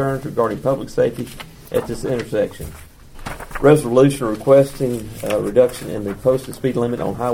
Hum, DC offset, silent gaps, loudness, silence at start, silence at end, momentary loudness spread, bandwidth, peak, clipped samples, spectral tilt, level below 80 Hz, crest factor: none; under 0.1%; none; -18 LUFS; 0 s; 0 s; 17 LU; 17.5 kHz; 0 dBFS; under 0.1%; -6.5 dB/octave; -40 dBFS; 18 dB